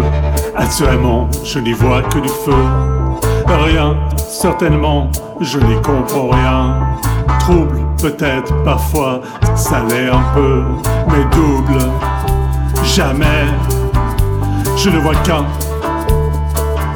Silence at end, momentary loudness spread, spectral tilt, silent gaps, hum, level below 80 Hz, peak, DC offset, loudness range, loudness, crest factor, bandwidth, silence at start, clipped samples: 0 s; 5 LU; -6 dB/octave; none; none; -18 dBFS; 0 dBFS; under 0.1%; 1 LU; -14 LUFS; 12 dB; over 20 kHz; 0 s; under 0.1%